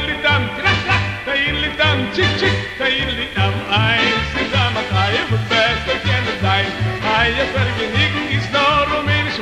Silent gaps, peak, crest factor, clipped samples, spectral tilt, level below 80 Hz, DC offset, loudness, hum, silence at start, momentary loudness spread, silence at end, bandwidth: none; -4 dBFS; 14 dB; under 0.1%; -5 dB/octave; -36 dBFS; under 0.1%; -16 LUFS; none; 0 s; 4 LU; 0 s; 11.5 kHz